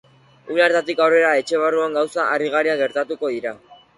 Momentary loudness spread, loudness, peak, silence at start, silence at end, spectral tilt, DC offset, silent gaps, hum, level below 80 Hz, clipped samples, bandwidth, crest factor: 9 LU; -19 LUFS; -4 dBFS; 0.45 s; 0.25 s; -4 dB/octave; under 0.1%; none; none; -70 dBFS; under 0.1%; 11.5 kHz; 16 dB